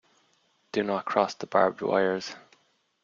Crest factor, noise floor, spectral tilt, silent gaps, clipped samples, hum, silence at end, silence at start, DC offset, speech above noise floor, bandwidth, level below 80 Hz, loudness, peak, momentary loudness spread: 22 dB; -68 dBFS; -5 dB/octave; none; under 0.1%; none; 0.65 s; 0.75 s; under 0.1%; 42 dB; 7.6 kHz; -72 dBFS; -27 LUFS; -8 dBFS; 10 LU